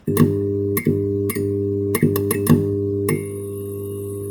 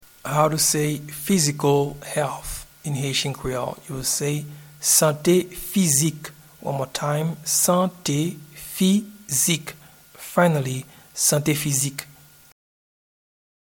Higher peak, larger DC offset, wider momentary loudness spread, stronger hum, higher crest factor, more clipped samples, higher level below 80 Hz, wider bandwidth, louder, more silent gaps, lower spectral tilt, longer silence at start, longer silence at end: about the same, -2 dBFS vs -2 dBFS; neither; second, 11 LU vs 15 LU; neither; about the same, 18 dB vs 20 dB; neither; about the same, -52 dBFS vs -50 dBFS; about the same, over 20 kHz vs 19 kHz; about the same, -21 LUFS vs -22 LUFS; neither; first, -7 dB/octave vs -4 dB/octave; second, 0.05 s vs 0.25 s; second, 0 s vs 1.65 s